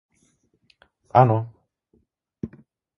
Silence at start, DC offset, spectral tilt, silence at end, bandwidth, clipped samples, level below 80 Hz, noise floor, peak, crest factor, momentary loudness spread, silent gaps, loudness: 1.15 s; under 0.1%; -10 dB/octave; 0.5 s; 6 kHz; under 0.1%; -58 dBFS; -66 dBFS; 0 dBFS; 24 dB; 20 LU; none; -20 LUFS